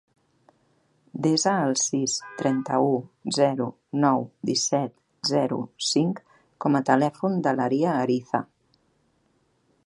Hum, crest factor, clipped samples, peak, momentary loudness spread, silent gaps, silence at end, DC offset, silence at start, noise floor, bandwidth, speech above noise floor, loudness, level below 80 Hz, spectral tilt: none; 22 dB; under 0.1%; -4 dBFS; 8 LU; none; 1.4 s; under 0.1%; 1.15 s; -68 dBFS; 11.5 kHz; 44 dB; -24 LUFS; -72 dBFS; -4.5 dB/octave